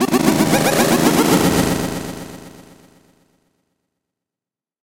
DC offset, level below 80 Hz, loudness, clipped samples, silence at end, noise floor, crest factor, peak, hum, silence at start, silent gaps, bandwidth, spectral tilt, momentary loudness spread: under 0.1%; -42 dBFS; -15 LUFS; under 0.1%; 2.35 s; -89 dBFS; 18 dB; 0 dBFS; none; 0 s; none; 17 kHz; -4.5 dB/octave; 18 LU